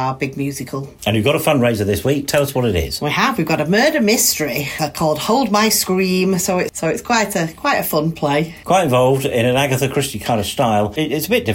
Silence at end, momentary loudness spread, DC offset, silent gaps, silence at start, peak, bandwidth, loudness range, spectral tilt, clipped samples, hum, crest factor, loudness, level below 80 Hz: 0 s; 7 LU; under 0.1%; none; 0 s; -4 dBFS; 16.5 kHz; 2 LU; -4.5 dB/octave; under 0.1%; none; 14 dB; -17 LUFS; -42 dBFS